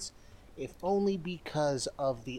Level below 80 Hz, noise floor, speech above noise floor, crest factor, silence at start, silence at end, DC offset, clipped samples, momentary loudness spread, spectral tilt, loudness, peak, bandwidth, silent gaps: -58 dBFS; -53 dBFS; 20 dB; 14 dB; 0 s; 0 s; under 0.1%; under 0.1%; 13 LU; -5 dB/octave; -33 LUFS; -20 dBFS; 15.5 kHz; none